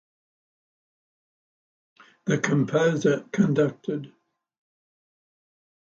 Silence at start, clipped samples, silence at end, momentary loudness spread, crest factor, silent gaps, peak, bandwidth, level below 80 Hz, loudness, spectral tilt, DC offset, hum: 2.25 s; under 0.1%; 1.9 s; 11 LU; 20 dB; none; -8 dBFS; 7.8 kHz; -70 dBFS; -24 LUFS; -6.5 dB/octave; under 0.1%; none